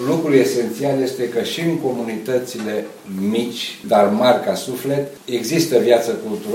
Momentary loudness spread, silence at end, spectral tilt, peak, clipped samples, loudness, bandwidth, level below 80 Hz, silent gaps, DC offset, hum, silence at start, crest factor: 10 LU; 0 s; -5 dB/octave; 0 dBFS; under 0.1%; -19 LUFS; 16.5 kHz; -66 dBFS; none; under 0.1%; none; 0 s; 18 dB